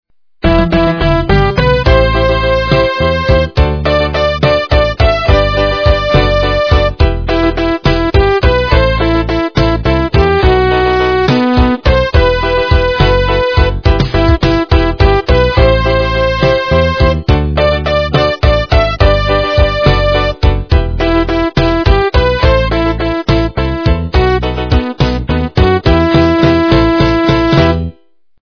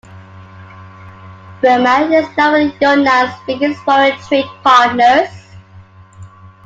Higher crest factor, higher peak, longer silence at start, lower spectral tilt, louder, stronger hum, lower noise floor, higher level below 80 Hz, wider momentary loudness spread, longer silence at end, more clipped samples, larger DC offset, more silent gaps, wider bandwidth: about the same, 10 dB vs 14 dB; about the same, 0 dBFS vs 0 dBFS; first, 0.45 s vs 0.1 s; first, -7.5 dB/octave vs -4.5 dB/octave; about the same, -11 LUFS vs -12 LUFS; neither; first, -49 dBFS vs -40 dBFS; first, -16 dBFS vs -56 dBFS; second, 4 LU vs 7 LU; first, 0.55 s vs 0.2 s; first, 0.4% vs under 0.1%; first, 0.5% vs under 0.1%; neither; second, 5.4 kHz vs 7.8 kHz